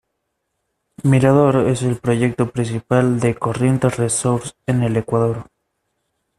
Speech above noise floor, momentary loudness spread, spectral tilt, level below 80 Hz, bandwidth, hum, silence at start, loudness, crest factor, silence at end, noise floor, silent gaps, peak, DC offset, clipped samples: 57 dB; 8 LU; -6.5 dB/octave; -50 dBFS; 12.5 kHz; none; 1 s; -18 LUFS; 16 dB; 0.95 s; -74 dBFS; none; -2 dBFS; under 0.1%; under 0.1%